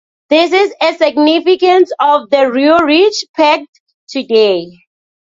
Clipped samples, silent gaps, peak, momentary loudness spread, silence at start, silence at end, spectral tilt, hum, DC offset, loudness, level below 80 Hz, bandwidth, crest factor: under 0.1%; 3.29-3.34 s, 3.69-3.73 s, 3.80-3.86 s, 3.94-4.07 s; 0 dBFS; 5 LU; 0.3 s; 0.7 s; -3.5 dB/octave; none; under 0.1%; -11 LUFS; -56 dBFS; 7.6 kHz; 12 dB